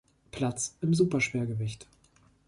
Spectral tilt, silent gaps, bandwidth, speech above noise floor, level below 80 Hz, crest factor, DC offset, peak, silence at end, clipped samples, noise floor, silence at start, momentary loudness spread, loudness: -5.5 dB/octave; none; 11.5 kHz; 34 dB; -60 dBFS; 18 dB; under 0.1%; -14 dBFS; 0.65 s; under 0.1%; -63 dBFS; 0.35 s; 14 LU; -29 LUFS